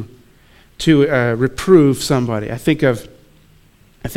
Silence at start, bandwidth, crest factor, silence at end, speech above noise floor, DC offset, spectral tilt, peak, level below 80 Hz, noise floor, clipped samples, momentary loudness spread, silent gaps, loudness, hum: 0 s; 16 kHz; 16 dB; 0 s; 35 dB; under 0.1%; -6 dB/octave; 0 dBFS; -42 dBFS; -50 dBFS; under 0.1%; 12 LU; none; -15 LUFS; none